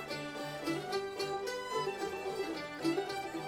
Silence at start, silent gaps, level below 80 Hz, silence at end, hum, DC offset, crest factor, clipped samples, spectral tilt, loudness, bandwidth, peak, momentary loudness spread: 0 s; none; -70 dBFS; 0 s; none; under 0.1%; 16 dB; under 0.1%; -4 dB/octave; -38 LUFS; 16.5 kHz; -22 dBFS; 4 LU